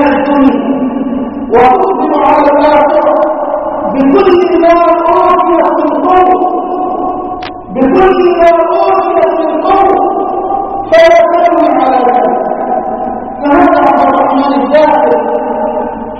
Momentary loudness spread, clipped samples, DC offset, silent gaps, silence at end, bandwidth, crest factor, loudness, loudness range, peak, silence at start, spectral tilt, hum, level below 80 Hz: 8 LU; 0.9%; 0.7%; none; 0 s; 6.4 kHz; 8 dB; -8 LUFS; 2 LU; 0 dBFS; 0 s; -6.5 dB/octave; none; -38 dBFS